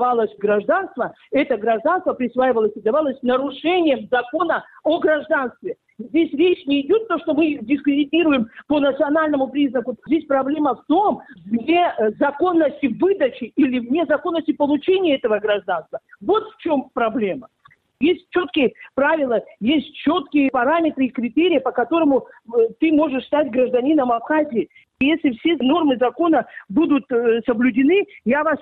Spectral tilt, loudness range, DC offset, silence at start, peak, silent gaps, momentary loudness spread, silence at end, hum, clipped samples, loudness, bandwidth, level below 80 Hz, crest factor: -8.5 dB/octave; 2 LU; under 0.1%; 0 s; -6 dBFS; none; 5 LU; 0.05 s; none; under 0.1%; -19 LUFS; 4.3 kHz; -58 dBFS; 12 dB